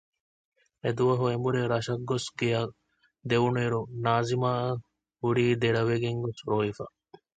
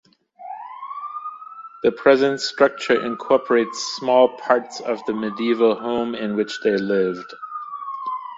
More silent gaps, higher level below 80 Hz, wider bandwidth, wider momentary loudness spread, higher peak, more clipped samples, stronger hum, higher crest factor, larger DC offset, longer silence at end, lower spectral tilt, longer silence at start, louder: neither; about the same, -60 dBFS vs -64 dBFS; first, 9.2 kHz vs 8 kHz; second, 8 LU vs 16 LU; second, -10 dBFS vs -2 dBFS; neither; neither; about the same, 18 dB vs 20 dB; neither; first, 0.5 s vs 0 s; first, -6.5 dB/octave vs -4.5 dB/octave; first, 0.85 s vs 0.4 s; second, -28 LUFS vs -21 LUFS